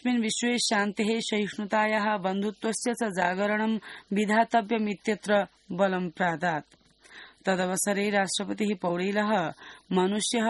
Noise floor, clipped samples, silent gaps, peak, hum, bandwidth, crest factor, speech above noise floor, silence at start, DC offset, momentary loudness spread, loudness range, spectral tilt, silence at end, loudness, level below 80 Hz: -51 dBFS; under 0.1%; none; -8 dBFS; none; 11.5 kHz; 18 dB; 24 dB; 0.05 s; under 0.1%; 5 LU; 2 LU; -4 dB/octave; 0 s; -27 LUFS; -70 dBFS